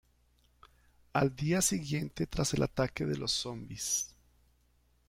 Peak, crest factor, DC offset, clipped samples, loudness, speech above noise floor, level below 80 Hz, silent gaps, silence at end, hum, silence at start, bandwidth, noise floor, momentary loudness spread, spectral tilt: -16 dBFS; 20 dB; under 0.1%; under 0.1%; -33 LUFS; 37 dB; -54 dBFS; none; 1 s; 60 Hz at -60 dBFS; 1.15 s; 16.5 kHz; -70 dBFS; 7 LU; -4 dB/octave